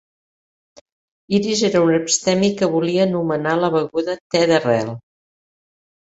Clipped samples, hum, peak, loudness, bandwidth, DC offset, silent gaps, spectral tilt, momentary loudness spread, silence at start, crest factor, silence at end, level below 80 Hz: under 0.1%; none; -2 dBFS; -18 LUFS; 8.2 kHz; under 0.1%; 4.21-4.30 s; -4.5 dB/octave; 6 LU; 1.3 s; 16 dB; 1.1 s; -60 dBFS